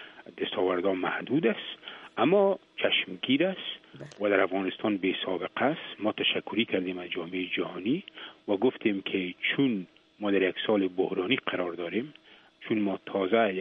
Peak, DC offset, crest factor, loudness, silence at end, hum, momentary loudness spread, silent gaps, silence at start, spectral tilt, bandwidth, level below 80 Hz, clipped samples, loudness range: -10 dBFS; under 0.1%; 18 dB; -29 LUFS; 0 s; none; 10 LU; none; 0 s; -7 dB/octave; 6.6 kHz; -76 dBFS; under 0.1%; 3 LU